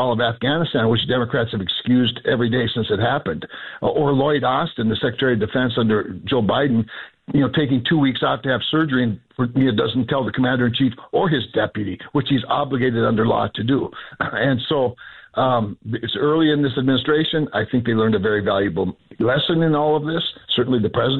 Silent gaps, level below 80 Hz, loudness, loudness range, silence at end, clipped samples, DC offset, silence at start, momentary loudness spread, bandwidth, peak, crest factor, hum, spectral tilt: none; -50 dBFS; -20 LUFS; 1 LU; 0 s; under 0.1%; under 0.1%; 0 s; 6 LU; 4.4 kHz; -8 dBFS; 12 dB; none; -9 dB/octave